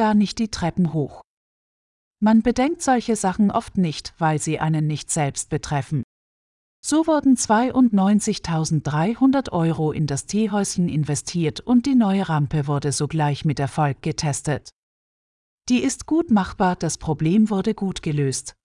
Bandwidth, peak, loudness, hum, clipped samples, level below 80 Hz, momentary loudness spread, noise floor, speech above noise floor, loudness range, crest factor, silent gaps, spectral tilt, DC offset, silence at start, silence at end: 12 kHz; -6 dBFS; -21 LUFS; none; under 0.1%; -48 dBFS; 7 LU; under -90 dBFS; over 70 dB; 4 LU; 14 dB; 1.24-2.11 s, 6.04-6.83 s, 14.73-15.58 s; -5.5 dB/octave; under 0.1%; 0 s; 0.15 s